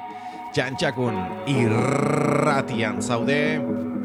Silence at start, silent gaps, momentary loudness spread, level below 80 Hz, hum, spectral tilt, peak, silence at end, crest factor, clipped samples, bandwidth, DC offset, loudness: 0 s; none; 7 LU; -58 dBFS; none; -6 dB/octave; -8 dBFS; 0 s; 14 dB; under 0.1%; 13.5 kHz; under 0.1%; -23 LUFS